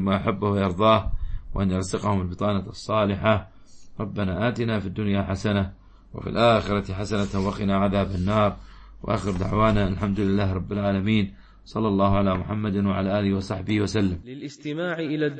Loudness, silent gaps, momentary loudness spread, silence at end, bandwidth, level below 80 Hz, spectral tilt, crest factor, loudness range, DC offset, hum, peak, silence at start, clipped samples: -24 LUFS; none; 11 LU; 0 s; 8.8 kHz; -40 dBFS; -7 dB/octave; 18 dB; 2 LU; under 0.1%; none; -6 dBFS; 0 s; under 0.1%